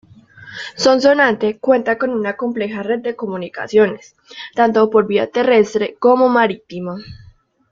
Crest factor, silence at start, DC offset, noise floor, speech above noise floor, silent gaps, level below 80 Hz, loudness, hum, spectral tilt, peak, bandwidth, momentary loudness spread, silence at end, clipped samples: 16 dB; 0.4 s; under 0.1%; -41 dBFS; 25 dB; none; -56 dBFS; -16 LUFS; none; -5 dB/octave; 0 dBFS; 7.6 kHz; 15 LU; 0.55 s; under 0.1%